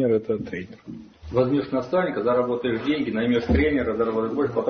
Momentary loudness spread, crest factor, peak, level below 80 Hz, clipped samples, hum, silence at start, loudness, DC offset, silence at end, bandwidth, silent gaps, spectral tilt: 13 LU; 16 dB; -8 dBFS; -42 dBFS; under 0.1%; none; 0 s; -23 LUFS; under 0.1%; 0 s; 6.6 kHz; none; -8.5 dB/octave